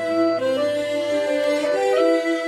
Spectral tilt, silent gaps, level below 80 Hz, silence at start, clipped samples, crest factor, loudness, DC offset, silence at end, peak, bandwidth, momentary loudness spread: -4 dB/octave; none; -68 dBFS; 0 s; under 0.1%; 12 dB; -20 LUFS; under 0.1%; 0 s; -8 dBFS; 14.5 kHz; 4 LU